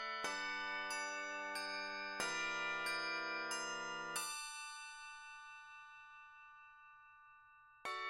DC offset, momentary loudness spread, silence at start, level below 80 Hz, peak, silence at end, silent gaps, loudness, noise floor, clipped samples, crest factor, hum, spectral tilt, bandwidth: under 0.1%; 20 LU; 0 s; -80 dBFS; -24 dBFS; 0 s; none; -42 LUFS; -65 dBFS; under 0.1%; 22 dB; none; -0.5 dB/octave; 16 kHz